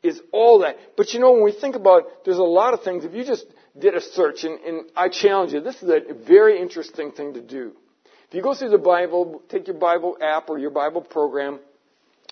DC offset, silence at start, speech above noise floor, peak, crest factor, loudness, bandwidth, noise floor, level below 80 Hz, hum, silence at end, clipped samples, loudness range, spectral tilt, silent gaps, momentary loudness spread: under 0.1%; 0.05 s; 44 dB; 0 dBFS; 18 dB; -19 LUFS; 6.6 kHz; -63 dBFS; -78 dBFS; none; 0.75 s; under 0.1%; 5 LU; -4.5 dB/octave; none; 16 LU